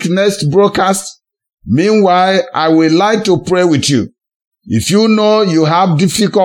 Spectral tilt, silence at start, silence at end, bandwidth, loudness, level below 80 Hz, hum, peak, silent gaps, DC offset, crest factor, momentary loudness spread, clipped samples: -5 dB/octave; 0 s; 0 s; 17 kHz; -11 LUFS; -48 dBFS; none; 0 dBFS; 4.35-4.51 s; under 0.1%; 12 dB; 7 LU; under 0.1%